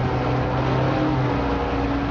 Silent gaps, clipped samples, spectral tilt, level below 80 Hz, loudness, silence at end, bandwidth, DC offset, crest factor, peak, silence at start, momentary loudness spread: none; under 0.1%; -8 dB/octave; -32 dBFS; -22 LUFS; 0 s; 6.8 kHz; under 0.1%; 14 dB; -8 dBFS; 0 s; 2 LU